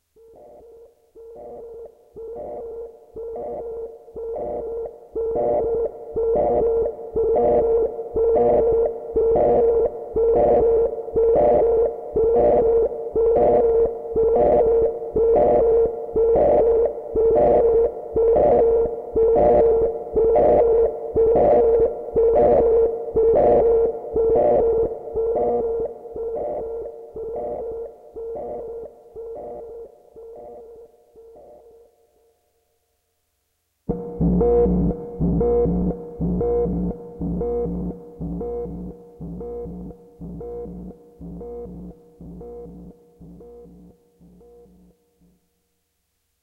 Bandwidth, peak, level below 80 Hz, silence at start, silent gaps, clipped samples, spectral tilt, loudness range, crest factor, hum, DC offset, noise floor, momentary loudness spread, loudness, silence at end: 2.8 kHz; -8 dBFS; -38 dBFS; 0.8 s; none; under 0.1%; -11.5 dB/octave; 19 LU; 14 dB; none; under 0.1%; -72 dBFS; 20 LU; -19 LUFS; 2.75 s